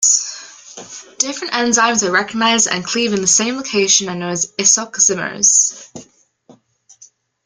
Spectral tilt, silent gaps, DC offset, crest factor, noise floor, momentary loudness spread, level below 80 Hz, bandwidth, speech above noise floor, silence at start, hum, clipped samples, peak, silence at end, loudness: -1 dB/octave; none; under 0.1%; 18 dB; -50 dBFS; 21 LU; -60 dBFS; 11 kHz; 33 dB; 0 s; none; under 0.1%; 0 dBFS; 1.45 s; -14 LUFS